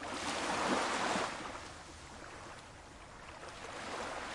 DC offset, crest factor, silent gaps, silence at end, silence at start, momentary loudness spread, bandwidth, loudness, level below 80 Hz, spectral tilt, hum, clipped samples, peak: under 0.1%; 20 dB; none; 0 s; 0 s; 18 LU; 11.5 kHz; -38 LUFS; -62 dBFS; -2.5 dB/octave; none; under 0.1%; -20 dBFS